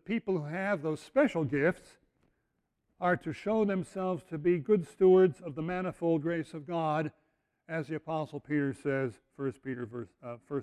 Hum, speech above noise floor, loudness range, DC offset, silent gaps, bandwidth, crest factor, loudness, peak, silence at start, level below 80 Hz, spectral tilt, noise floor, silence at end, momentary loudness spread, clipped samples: none; 49 dB; 6 LU; under 0.1%; none; 11 kHz; 18 dB; -31 LUFS; -14 dBFS; 0.1 s; -68 dBFS; -8 dB/octave; -80 dBFS; 0 s; 12 LU; under 0.1%